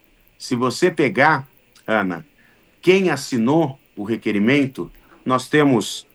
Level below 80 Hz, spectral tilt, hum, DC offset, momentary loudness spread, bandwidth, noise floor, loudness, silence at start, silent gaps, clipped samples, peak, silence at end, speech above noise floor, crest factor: -60 dBFS; -5.5 dB/octave; none; under 0.1%; 16 LU; 20 kHz; -55 dBFS; -19 LUFS; 0.4 s; none; under 0.1%; -2 dBFS; 0.15 s; 37 dB; 18 dB